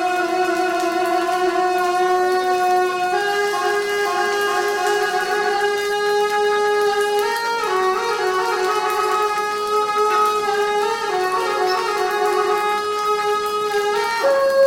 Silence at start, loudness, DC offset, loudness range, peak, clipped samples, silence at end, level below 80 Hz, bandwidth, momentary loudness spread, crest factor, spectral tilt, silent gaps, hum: 0 s; -19 LUFS; under 0.1%; 1 LU; -6 dBFS; under 0.1%; 0 s; -60 dBFS; 17 kHz; 3 LU; 12 dB; -2 dB/octave; none; none